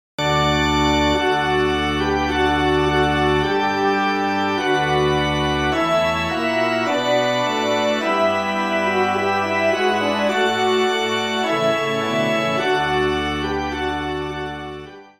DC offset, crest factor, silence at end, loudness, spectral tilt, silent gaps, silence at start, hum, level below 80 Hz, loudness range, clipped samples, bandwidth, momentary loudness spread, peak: 0.1%; 14 dB; 0.15 s; -19 LUFS; -5 dB/octave; none; 0.2 s; none; -40 dBFS; 2 LU; under 0.1%; 15.5 kHz; 5 LU; -6 dBFS